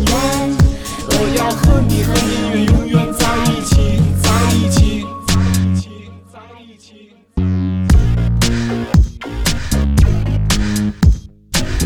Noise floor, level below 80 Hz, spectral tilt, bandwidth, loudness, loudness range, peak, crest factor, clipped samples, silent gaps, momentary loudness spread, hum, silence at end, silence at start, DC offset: -44 dBFS; -20 dBFS; -5.5 dB/octave; 19 kHz; -15 LUFS; 4 LU; -2 dBFS; 12 dB; under 0.1%; none; 7 LU; none; 0 s; 0 s; under 0.1%